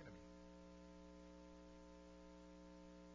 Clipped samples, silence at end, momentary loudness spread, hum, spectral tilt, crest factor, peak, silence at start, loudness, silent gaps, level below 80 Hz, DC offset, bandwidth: under 0.1%; 0 s; 1 LU; 60 Hz at -65 dBFS; -6 dB/octave; 14 dB; -46 dBFS; 0 s; -62 LUFS; none; -68 dBFS; under 0.1%; 8 kHz